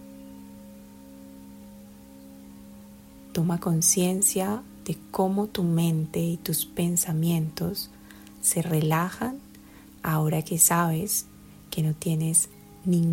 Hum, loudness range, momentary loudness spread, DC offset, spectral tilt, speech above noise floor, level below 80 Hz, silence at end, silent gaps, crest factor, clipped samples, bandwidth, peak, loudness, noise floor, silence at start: none; 3 LU; 25 LU; under 0.1%; -4.5 dB/octave; 24 dB; -56 dBFS; 0 s; none; 22 dB; under 0.1%; 16.5 kHz; -4 dBFS; -25 LUFS; -49 dBFS; 0 s